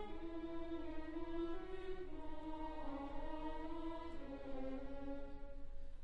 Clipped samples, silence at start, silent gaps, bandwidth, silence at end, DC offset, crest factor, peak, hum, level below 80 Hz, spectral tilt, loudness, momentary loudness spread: under 0.1%; 0 s; none; 5 kHz; 0 s; 0.1%; 12 dB; -32 dBFS; none; -52 dBFS; -7.5 dB/octave; -49 LUFS; 5 LU